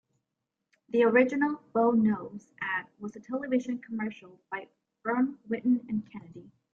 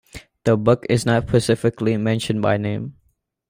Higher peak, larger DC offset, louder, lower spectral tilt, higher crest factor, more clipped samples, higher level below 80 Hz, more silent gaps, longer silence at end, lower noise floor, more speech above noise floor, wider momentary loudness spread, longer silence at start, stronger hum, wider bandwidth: second, -10 dBFS vs -4 dBFS; neither; second, -29 LUFS vs -20 LUFS; about the same, -7.5 dB/octave vs -6.5 dB/octave; about the same, 20 dB vs 16 dB; neither; second, -74 dBFS vs -48 dBFS; neither; second, 0.35 s vs 0.6 s; first, -85 dBFS vs -66 dBFS; first, 56 dB vs 47 dB; first, 17 LU vs 8 LU; first, 0.95 s vs 0.15 s; neither; second, 7.2 kHz vs 16 kHz